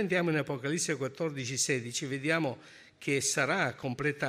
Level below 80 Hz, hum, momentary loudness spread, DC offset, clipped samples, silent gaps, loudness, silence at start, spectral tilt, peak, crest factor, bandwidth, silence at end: -70 dBFS; none; 7 LU; under 0.1%; under 0.1%; none; -31 LUFS; 0 s; -3.5 dB/octave; -14 dBFS; 18 dB; 15.5 kHz; 0 s